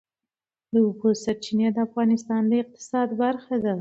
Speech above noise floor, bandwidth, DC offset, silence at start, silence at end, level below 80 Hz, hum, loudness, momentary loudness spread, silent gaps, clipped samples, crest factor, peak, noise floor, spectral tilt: 66 dB; 8 kHz; under 0.1%; 0.75 s; 0 s; -66 dBFS; none; -24 LUFS; 4 LU; none; under 0.1%; 14 dB; -10 dBFS; -89 dBFS; -6.5 dB/octave